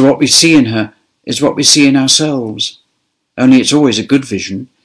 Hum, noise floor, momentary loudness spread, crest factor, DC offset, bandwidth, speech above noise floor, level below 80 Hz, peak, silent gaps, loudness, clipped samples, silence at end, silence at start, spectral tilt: none; -66 dBFS; 14 LU; 12 dB; under 0.1%; 11 kHz; 55 dB; -50 dBFS; 0 dBFS; none; -10 LUFS; 0.1%; 0.2 s; 0 s; -3.5 dB/octave